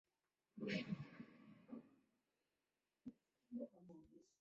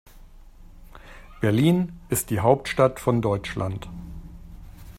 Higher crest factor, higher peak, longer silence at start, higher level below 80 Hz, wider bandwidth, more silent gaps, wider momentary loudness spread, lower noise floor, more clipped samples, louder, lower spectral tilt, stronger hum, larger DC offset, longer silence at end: about the same, 24 dB vs 22 dB; second, -32 dBFS vs -4 dBFS; first, 0.55 s vs 0.15 s; second, -86 dBFS vs -44 dBFS; second, 7.6 kHz vs 16 kHz; neither; about the same, 18 LU vs 20 LU; first, under -90 dBFS vs -46 dBFS; neither; second, -53 LUFS vs -23 LUFS; about the same, -5 dB/octave vs -6 dB/octave; neither; neither; first, 0.2 s vs 0 s